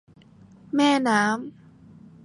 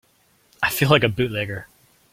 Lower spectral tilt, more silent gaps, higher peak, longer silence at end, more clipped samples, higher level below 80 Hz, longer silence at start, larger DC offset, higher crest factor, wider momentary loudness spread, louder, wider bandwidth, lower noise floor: about the same, -4 dB/octave vs -5 dB/octave; neither; second, -6 dBFS vs 0 dBFS; first, 0.75 s vs 0.5 s; neither; second, -68 dBFS vs -50 dBFS; first, 0.75 s vs 0.6 s; neither; about the same, 20 dB vs 22 dB; about the same, 11 LU vs 13 LU; about the same, -22 LUFS vs -20 LUFS; second, 11.5 kHz vs 16.5 kHz; second, -51 dBFS vs -61 dBFS